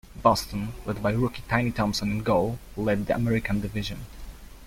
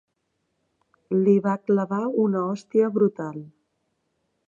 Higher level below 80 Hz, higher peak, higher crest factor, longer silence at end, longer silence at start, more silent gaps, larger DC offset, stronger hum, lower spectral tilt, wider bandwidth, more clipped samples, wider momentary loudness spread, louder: first, -42 dBFS vs -76 dBFS; first, -4 dBFS vs -8 dBFS; first, 22 dB vs 16 dB; second, 0 s vs 1 s; second, 0.1 s vs 1.1 s; neither; neither; neither; second, -6 dB/octave vs -9.5 dB/octave; first, 16.5 kHz vs 7.4 kHz; neither; about the same, 11 LU vs 10 LU; second, -27 LUFS vs -23 LUFS